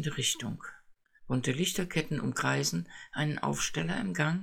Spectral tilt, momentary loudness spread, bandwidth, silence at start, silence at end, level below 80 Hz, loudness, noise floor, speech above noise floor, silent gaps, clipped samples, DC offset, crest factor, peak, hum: -4 dB/octave; 9 LU; 17 kHz; 0 s; 0 s; -56 dBFS; -32 LUFS; -58 dBFS; 26 dB; none; under 0.1%; under 0.1%; 18 dB; -14 dBFS; none